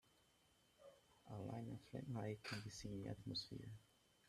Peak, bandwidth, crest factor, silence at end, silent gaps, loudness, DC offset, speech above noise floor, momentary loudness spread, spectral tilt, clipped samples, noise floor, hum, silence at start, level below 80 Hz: -36 dBFS; 14 kHz; 18 dB; 0.45 s; none; -51 LUFS; under 0.1%; 26 dB; 19 LU; -5.5 dB/octave; under 0.1%; -77 dBFS; none; 0.8 s; -74 dBFS